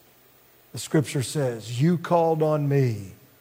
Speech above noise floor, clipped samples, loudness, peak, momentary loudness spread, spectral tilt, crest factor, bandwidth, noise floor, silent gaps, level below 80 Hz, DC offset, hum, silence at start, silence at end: 33 dB; under 0.1%; -24 LUFS; -8 dBFS; 14 LU; -6.5 dB/octave; 16 dB; 16 kHz; -56 dBFS; none; -68 dBFS; under 0.1%; none; 0.75 s; 0.25 s